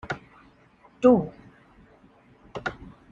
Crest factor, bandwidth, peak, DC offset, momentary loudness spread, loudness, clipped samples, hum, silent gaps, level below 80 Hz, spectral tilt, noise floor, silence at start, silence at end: 22 dB; 7.6 kHz; -6 dBFS; under 0.1%; 21 LU; -24 LUFS; under 0.1%; none; none; -56 dBFS; -7.5 dB/octave; -57 dBFS; 0.05 s; 0.4 s